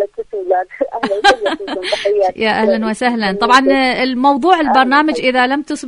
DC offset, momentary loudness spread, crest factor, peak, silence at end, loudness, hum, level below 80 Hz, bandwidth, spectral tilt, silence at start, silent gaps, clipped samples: under 0.1%; 9 LU; 14 dB; 0 dBFS; 0 s; -14 LUFS; none; -48 dBFS; 11 kHz; -4 dB/octave; 0 s; none; under 0.1%